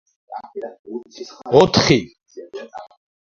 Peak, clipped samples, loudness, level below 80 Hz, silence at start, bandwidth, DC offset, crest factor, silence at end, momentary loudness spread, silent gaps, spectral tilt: 0 dBFS; under 0.1%; -15 LUFS; -48 dBFS; 0.3 s; 8 kHz; under 0.1%; 20 dB; 0.4 s; 23 LU; 0.79-0.84 s; -5 dB/octave